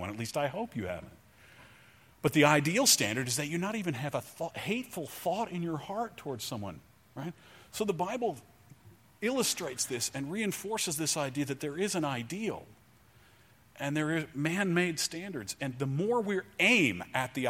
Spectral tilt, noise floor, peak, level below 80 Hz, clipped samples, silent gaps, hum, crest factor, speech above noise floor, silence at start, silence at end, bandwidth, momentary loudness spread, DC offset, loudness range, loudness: -3.5 dB/octave; -61 dBFS; -8 dBFS; -68 dBFS; under 0.1%; none; none; 24 dB; 30 dB; 0 s; 0 s; 16.5 kHz; 15 LU; under 0.1%; 8 LU; -31 LUFS